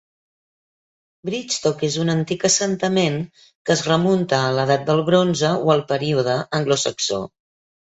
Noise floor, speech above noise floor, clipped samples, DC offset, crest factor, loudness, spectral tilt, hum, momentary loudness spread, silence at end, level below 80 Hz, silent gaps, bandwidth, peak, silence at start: under -90 dBFS; over 71 dB; under 0.1%; under 0.1%; 18 dB; -20 LUFS; -4.5 dB/octave; none; 10 LU; 0.55 s; -58 dBFS; 3.55-3.65 s; 8.4 kHz; -4 dBFS; 1.25 s